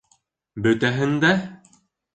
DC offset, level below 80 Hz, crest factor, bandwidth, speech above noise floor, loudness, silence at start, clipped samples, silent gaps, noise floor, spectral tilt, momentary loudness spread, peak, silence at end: under 0.1%; -56 dBFS; 18 dB; 9 kHz; 45 dB; -21 LUFS; 0.55 s; under 0.1%; none; -65 dBFS; -6 dB/octave; 17 LU; -6 dBFS; 0.6 s